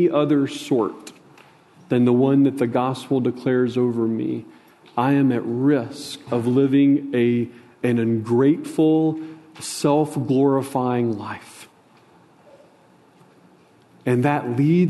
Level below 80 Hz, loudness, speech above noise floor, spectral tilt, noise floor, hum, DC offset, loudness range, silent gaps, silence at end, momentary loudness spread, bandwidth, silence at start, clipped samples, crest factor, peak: -66 dBFS; -20 LUFS; 34 dB; -7 dB/octave; -53 dBFS; none; under 0.1%; 7 LU; none; 0 s; 13 LU; 12.5 kHz; 0 s; under 0.1%; 16 dB; -4 dBFS